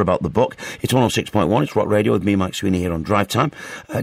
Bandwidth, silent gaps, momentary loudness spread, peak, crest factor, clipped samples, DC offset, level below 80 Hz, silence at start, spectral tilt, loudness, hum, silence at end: 16 kHz; none; 5 LU; -2 dBFS; 16 dB; under 0.1%; under 0.1%; -44 dBFS; 0 s; -6 dB/octave; -19 LUFS; none; 0 s